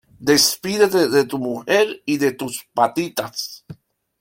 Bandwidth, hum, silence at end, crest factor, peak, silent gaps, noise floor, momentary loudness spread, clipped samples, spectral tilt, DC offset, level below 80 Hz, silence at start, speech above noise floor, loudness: 17 kHz; none; 0.5 s; 18 dB; -2 dBFS; none; -42 dBFS; 13 LU; under 0.1%; -3 dB/octave; under 0.1%; -60 dBFS; 0.2 s; 23 dB; -19 LUFS